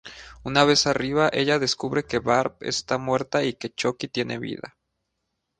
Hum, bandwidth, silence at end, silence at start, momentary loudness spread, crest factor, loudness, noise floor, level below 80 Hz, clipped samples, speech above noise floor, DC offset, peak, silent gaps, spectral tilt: none; 10 kHz; 0.9 s; 0.05 s; 14 LU; 22 dB; -23 LUFS; -78 dBFS; -54 dBFS; under 0.1%; 55 dB; under 0.1%; -2 dBFS; none; -4 dB/octave